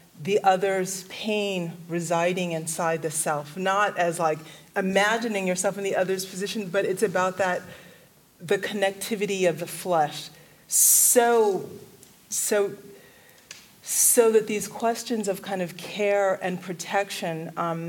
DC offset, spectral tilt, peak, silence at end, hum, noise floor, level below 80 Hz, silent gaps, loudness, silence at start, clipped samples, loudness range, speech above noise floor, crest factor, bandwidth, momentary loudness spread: under 0.1%; -3 dB/octave; -6 dBFS; 0 s; none; -54 dBFS; -72 dBFS; none; -24 LUFS; 0.15 s; under 0.1%; 6 LU; 30 dB; 20 dB; 17 kHz; 13 LU